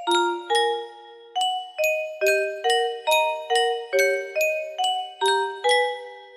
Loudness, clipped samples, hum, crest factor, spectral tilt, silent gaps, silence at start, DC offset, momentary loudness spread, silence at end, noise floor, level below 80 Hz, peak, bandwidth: -23 LUFS; under 0.1%; none; 16 dB; 0.5 dB/octave; none; 0 s; under 0.1%; 5 LU; 0 s; -44 dBFS; -74 dBFS; -8 dBFS; 16 kHz